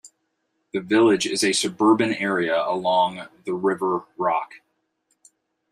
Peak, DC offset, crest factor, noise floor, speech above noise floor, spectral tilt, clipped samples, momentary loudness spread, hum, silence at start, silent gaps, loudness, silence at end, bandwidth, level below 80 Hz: -6 dBFS; under 0.1%; 18 dB; -74 dBFS; 52 dB; -3.5 dB/octave; under 0.1%; 12 LU; none; 0.05 s; none; -22 LUFS; 1.15 s; 13 kHz; -70 dBFS